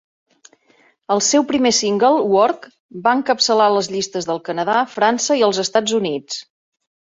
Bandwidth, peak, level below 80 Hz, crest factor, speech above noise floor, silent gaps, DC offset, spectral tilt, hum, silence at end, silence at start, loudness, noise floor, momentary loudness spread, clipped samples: 8 kHz; -2 dBFS; -62 dBFS; 16 dB; 39 dB; 2.80-2.89 s; under 0.1%; -3 dB/octave; none; 0.6 s; 1.1 s; -17 LUFS; -56 dBFS; 9 LU; under 0.1%